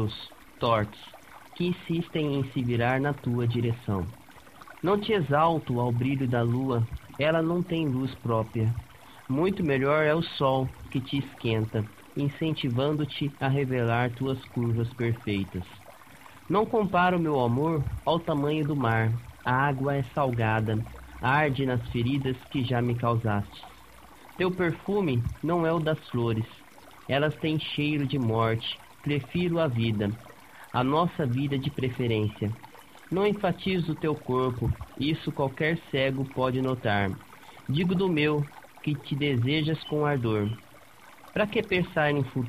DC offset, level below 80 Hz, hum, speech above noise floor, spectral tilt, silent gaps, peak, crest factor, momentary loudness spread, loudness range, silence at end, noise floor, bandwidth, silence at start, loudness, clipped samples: 0.1%; -52 dBFS; none; 26 dB; -7.5 dB/octave; none; -10 dBFS; 18 dB; 8 LU; 2 LU; 0 s; -52 dBFS; 15 kHz; 0 s; -28 LUFS; under 0.1%